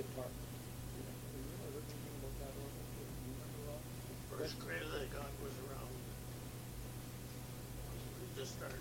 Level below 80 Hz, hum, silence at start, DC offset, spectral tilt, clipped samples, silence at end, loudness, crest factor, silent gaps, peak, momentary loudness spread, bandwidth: -56 dBFS; none; 0 s; under 0.1%; -5 dB/octave; under 0.1%; 0 s; -48 LUFS; 16 dB; none; -30 dBFS; 5 LU; 16.5 kHz